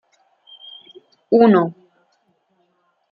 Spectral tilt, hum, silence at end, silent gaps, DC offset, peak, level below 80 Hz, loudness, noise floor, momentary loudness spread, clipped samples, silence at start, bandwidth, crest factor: -9.5 dB/octave; none; 1.4 s; none; under 0.1%; -2 dBFS; -66 dBFS; -15 LUFS; -66 dBFS; 26 LU; under 0.1%; 1.3 s; 5 kHz; 18 dB